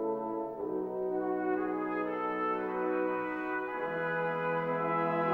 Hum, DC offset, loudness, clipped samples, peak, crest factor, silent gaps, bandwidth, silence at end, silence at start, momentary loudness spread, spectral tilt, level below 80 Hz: none; under 0.1%; -33 LUFS; under 0.1%; -18 dBFS; 14 dB; none; 16.5 kHz; 0 s; 0 s; 4 LU; -8.5 dB/octave; -70 dBFS